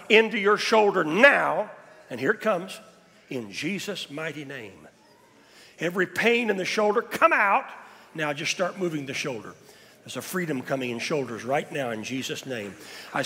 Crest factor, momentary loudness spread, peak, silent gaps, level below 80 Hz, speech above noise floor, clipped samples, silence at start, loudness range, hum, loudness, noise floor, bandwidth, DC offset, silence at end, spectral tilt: 22 dB; 19 LU; -4 dBFS; none; -74 dBFS; 31 dB; under 0.1%; 0 s; 8 LU; none; -25 LUFS; -56 dBFS; 16 kHz; under 0.1%; 0 s; -4 dB/octave